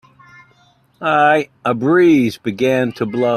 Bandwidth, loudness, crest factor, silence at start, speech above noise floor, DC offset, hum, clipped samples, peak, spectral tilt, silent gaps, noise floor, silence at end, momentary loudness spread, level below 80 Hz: 13.5 kHz; -15 LUFS; 16 dB; 1 s; 39 dB; under 0.1%; none; under 0.1%; 0 dBFS; -6.5 dB/octave; none; -54 dBFS; 0 s; 9 LU; -58 dBFS